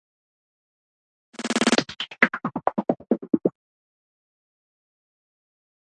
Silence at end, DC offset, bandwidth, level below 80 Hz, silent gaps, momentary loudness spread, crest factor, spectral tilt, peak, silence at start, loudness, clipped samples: 2.5 s; under 0.1%; 11 kHz; -70 dBFS; none; 8 LU; 28 dB; -3.5 dB/octave; 0 dBFS; 1.4 s; -24 LUFS; under 0.1%